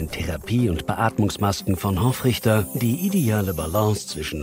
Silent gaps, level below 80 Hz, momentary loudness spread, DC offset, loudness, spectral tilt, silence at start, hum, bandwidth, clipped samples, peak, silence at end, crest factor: none; -42 dBFS; 4 LU; under 0.1%; -22 LUFS; -6 dB/octave; 0 s; none; 16 kHz; under 0.1%; -4 dBFS; 0 s; 16 dB